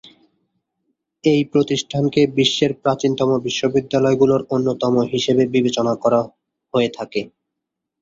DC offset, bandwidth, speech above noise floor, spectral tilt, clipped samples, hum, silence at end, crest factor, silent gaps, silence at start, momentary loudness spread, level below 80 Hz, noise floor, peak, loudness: under 0.1%; 7.8 kHz; 63 dB; -5.5 dB/octave; under 0.1%; none; 0.75 s; 16 dB; none; 1.25 s; 6 LU; -56 dBFS; -81 dBFS; -2 dBFS; -18 LUFS